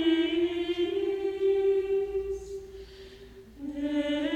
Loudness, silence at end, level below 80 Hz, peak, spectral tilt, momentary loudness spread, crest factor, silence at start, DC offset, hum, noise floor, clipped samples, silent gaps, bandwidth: -29 LUFS; 0 s; -54 dBFS; -14 dBFS; -5.5 dB/octave; 21 LU; 14 dB; 0 s; under 0.1%; none; -49 dBFS; under 0.1%; none; 8.8 kHz